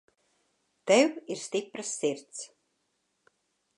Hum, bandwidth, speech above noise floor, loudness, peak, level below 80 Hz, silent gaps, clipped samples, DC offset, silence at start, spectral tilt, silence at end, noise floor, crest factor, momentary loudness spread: none; 11 kHz; 49 dB; -28 LUFS; -10 dBFS; -88 dBFS; none; under 0.1%; under 0.1%; 0.85 s; -3 dB/octave; 1.3 s; -77 dBFS; 22 dB; 19 LU